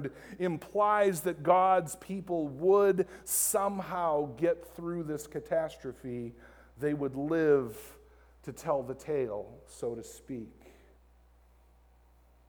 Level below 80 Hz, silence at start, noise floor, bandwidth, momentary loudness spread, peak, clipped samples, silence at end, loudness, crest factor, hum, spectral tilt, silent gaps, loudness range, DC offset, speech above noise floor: -62 dBFS; 0 s; -62 dBFS; over 20 kHz; 17 LU; -12 dBFS; under 0.1%; 2 s; -31 LUFS; 20 dB; none; -5 dB/octave; none; 10 LU; under 0.1%; 31 dB